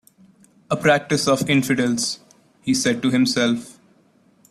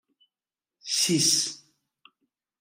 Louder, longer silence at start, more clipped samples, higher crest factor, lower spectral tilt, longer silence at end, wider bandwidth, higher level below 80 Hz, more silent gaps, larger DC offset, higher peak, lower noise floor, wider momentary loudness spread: first, -20 LUFS vs -23 LUFS; second, 0.7 s vs 0.85 s; neither; about the same, 18 dB vs 20 dB; first, -4 dB/octave vs -2 dB/octave; second, 0.8 s vs 1.05 s; second, 14.5 kHz vs 16 kHz; first, -58 dBFS vs -78 dBFS; neither; neither; first, -4 dBFS vs -10 dBFS; second, -57 dBFS vs under -90 dBFS; second, 9 LU vs 23 LU